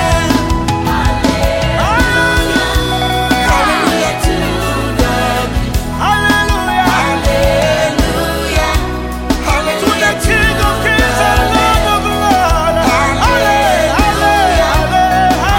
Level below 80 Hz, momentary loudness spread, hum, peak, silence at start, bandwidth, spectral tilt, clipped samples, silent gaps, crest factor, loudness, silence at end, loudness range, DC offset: -20 dBFS; 4 LU; none; 0 dBFS; 0 s; 17 kHz; -4.5 dB/octave; under 0.1%; none; 10 dB; -12 LUFS; 0 s; 2 LU; under 0.1%